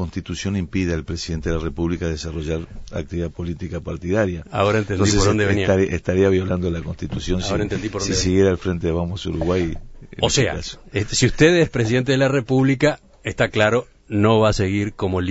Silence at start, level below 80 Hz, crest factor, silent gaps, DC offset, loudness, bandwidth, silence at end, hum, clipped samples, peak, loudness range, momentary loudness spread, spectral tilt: 0 s; -36 dBFS; 18 dB; none; under 0.1%; -20 LUFS; 8 kHz; 0 s; none; under 0.1%; -2 dBFS; 7 LU; 11 LU; -5.5 dB/octave